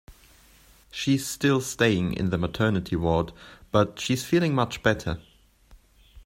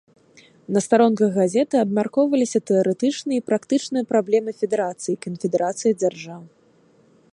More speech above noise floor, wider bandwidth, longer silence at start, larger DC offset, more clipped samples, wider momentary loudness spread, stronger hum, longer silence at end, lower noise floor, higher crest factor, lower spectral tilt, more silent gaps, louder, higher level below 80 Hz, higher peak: second, 31 dB vs 36 dB; first, 16 kHz vs 11.5 kHz; second, 0.1 s vs 0.7 s; neither; neither; about the same, 8 LU vs 8 LU; neither; second, 0.05 s vs 0.9 s; about the same, -55 dBFS vs -56 dBFS; about the same, 22 dB vs 18 dB; about the same, -5.5 dB/octave vs -5.5 dB/octave; neither; second, -25 LUFS vs -21 LUFS; first, -48 dBFS vs -70 dBFS; about the same, -4 dBFS vs -4 dBFS